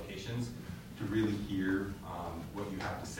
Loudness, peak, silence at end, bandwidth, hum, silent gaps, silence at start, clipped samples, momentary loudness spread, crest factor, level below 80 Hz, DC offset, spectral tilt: -38 LUFS; -22 dBFS; 0 s; 16 kHz; none; none; 0 s; under 0.1%; 9 LU; 16 dB; -54 dBFS; under 0.1%; -6 dB/octave